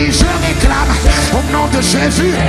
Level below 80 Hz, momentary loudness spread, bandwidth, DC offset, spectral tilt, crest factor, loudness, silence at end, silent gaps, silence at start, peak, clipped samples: -16 dBFS; 2 LU; 14 kHz; under 0.1%; -4.5 dB/octave; 12 dB; -12 LUFS; 0 s; none; 0 s; 0 dBFS; under 0.1%